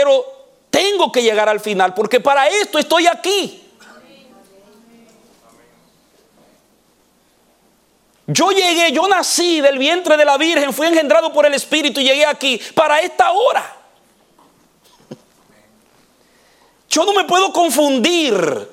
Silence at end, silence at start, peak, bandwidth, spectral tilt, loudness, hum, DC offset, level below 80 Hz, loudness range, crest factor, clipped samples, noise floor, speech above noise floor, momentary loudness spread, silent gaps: 0.05 s; 0 s; 0 dBFS; 17 kHz; -2.5 dB/octave; -14 LUFS; none; under 0.1%; -66 dBFS; 9 LU; 16 dB; under 0.1%; -56 dBFS; 42 dB; 5 LU; none